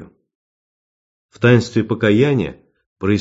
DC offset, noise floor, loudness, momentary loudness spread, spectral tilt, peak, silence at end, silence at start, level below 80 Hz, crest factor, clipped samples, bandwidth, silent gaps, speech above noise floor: under 0.1%; under -90 dBFS; -16 LUFS; 9 LU; -7.5 dB/octave; 0 dBFS; 0 s; 0 s; -46 dBFS; 18 dB; under 0.1%; 7.8 kHz; 0.35-1.29 s, 2.86-2.96 s; over 75 dB